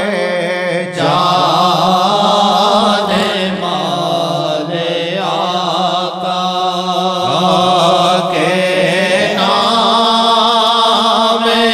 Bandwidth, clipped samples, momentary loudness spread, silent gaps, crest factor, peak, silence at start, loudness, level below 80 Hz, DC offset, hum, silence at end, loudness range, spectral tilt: 16 kHz; under 0.1%; 6 LU; none; 10 dB; -2 dBFS; 0 s; -12 LUFS; -54 dBFS; under 0.1%; none; 0 s; 5 LU; -4 dB/octave